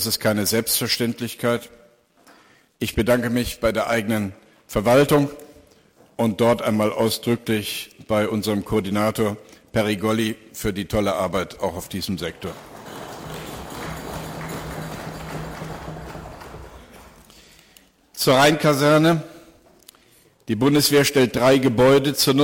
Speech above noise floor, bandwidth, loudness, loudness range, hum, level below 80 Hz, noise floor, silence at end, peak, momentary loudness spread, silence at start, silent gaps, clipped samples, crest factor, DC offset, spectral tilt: 36 dB; 17 kHz; -21 LUFS; 14 LU; none; -46 dBFS; -56 dBFS; 0 s; -4 dBFS; 19 LU; 0 s; none; under 0.1%; 18 dB; under 0.1%; -4.5 dB/octave